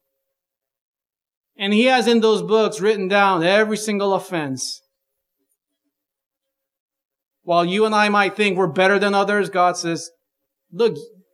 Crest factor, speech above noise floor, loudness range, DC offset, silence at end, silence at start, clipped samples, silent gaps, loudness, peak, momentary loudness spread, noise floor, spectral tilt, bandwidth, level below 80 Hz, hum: 20 dB; 66 dB; 10 LU; under 0.1%; 0.25 s; 1.6 s; under 0.1%; 6.26-6.31 s, 6.80-6.89 s, 7.05-7.09 s, 7.26-7.31 s; -18 LUFS; -2 dBFS; 11 LU; -84 dBFS; -4.5 dB/octave; 14 kHz; -80 dBFS; none